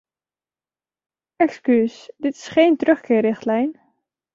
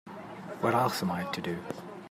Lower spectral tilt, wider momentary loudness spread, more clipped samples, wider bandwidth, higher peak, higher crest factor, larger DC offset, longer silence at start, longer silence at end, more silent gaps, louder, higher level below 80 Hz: about the same, -6 dB/octave vs -5.5 dB/octave; second, 10 LU vs 15 LU; neither; second, 7.6 kHz vs 16 kHz; first, -4 dBFS vs -14 dBFS; about the same, 18 dB vs 20 dB; neither; first, 1.4 s vs 0.05 s; first, 0.6 s vs 0 s; neither; first, -19 LUFS vs -31 LUFS; first, -66 dBFS vs -72 dBFS